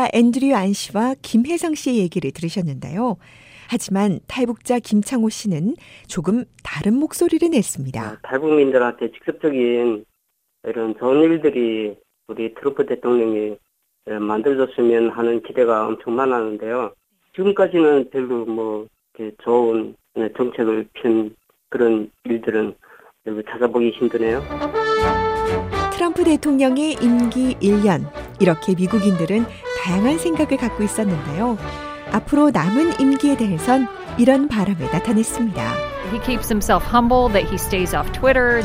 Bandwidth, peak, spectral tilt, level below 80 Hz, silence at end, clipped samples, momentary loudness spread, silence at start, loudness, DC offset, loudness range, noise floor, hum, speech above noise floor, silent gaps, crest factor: 16 kHz; 0 dBFS; -6 dB/octave; -38 dBFS; 0 s; under 0.1%; 10 LU; 0 s; -19 LUFS; under 0.1%; 4 LU; -71 dBFS; none; 52 dB; none; 18 dB